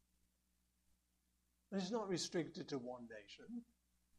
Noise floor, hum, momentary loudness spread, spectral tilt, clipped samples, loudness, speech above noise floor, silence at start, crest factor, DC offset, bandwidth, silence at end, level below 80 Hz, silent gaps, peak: -83 dBFS; 60 Hz at -70 dBFS; 13 LU; -4.5 dB/octave; under 0.1%; -46 LUFS; 37 dB; 1.7 s; 20 dB; under 0.1%; 13 kHz; 0.55 s; -82 dBFS; none; -30 dBFS